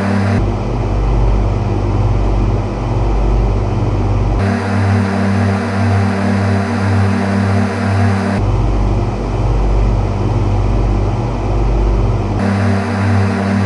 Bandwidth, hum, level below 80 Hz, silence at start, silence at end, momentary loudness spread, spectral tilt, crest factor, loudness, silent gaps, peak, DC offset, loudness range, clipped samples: 11 kHz; none; -18 dBFS; 0 s; 0 s; 3 LU; -8 dB/octave; 12 dB; -15 LUFS; none; -2 dBFS; under 0.1%; 2 LU; under 0.1%